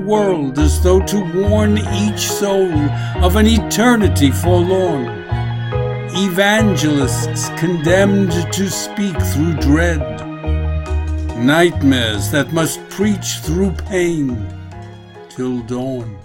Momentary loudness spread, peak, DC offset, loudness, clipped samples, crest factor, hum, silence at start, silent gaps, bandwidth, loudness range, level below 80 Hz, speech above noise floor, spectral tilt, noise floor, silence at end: 10 LU; 0 dBFS; under 0.1%; -16 LUFS; under 0.1%; 16 dB; none; 0 s; none; 16.5 kHz; 4 LU; -26 dBFS; 21 dB; -5.5 dB/octave; -35 dBFS; 0 s